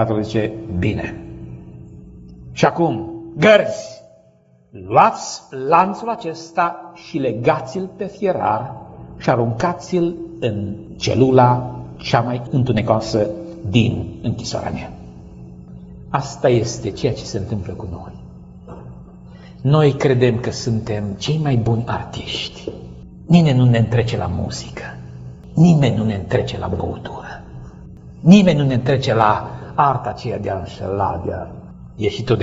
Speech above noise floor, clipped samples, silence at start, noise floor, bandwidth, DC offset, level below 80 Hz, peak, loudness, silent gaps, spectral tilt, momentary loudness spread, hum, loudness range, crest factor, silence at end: 35 dB; under 0.1%; 0 s; -53 dBFS; 8 kHz; under 0.1%; -42 dBFS; 0 dBFS; -18 LUFS; none; -6 dB/octave; 22 LU; none; 6 LU; 18 dB; 0 s